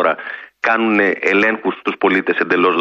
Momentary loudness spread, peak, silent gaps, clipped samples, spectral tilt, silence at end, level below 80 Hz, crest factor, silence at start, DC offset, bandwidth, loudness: 7 LU; -2 dBFS; none; under 0.1%; -6 dB/octave; 0 s; -64 dBFS; 14 dB; 0 s; under 0.1%; 7.6 kHz; -16 LUFS